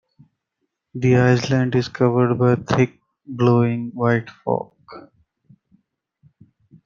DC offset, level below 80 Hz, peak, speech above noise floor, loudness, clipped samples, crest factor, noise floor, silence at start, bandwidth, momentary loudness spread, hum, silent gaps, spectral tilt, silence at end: under 0.1%; -56 dBFS; -2 dBFS; 58 dB; -19 LUFS; under 0.1%; 20 dB; -76 dBFS; 0.95 s; 7.2 kHz; 9 LU; none; none; -7.5 dB/octave; 1.85 s